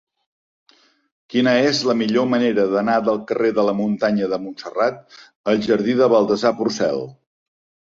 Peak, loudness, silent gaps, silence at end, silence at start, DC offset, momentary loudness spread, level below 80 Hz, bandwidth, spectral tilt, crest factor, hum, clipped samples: -4 dBFS; -19 LUFS; 5.36-5.44 s; 0.8 s; 1.3 s; under 0.1%; 9 LU; -62 dBFS; 7.6 kHz; -5.5 dB/octave; 16 dB; none; under 0.1%